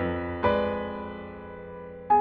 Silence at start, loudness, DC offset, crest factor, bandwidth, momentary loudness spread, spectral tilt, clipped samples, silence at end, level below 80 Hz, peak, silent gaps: 0 s; -28 LUFS; under 0.1%; 18 dB; 5.4 kHz; 16 LU; -5 dB/octave; under 0.1%; 0 s; -48 dBFS; -10 dBFS; none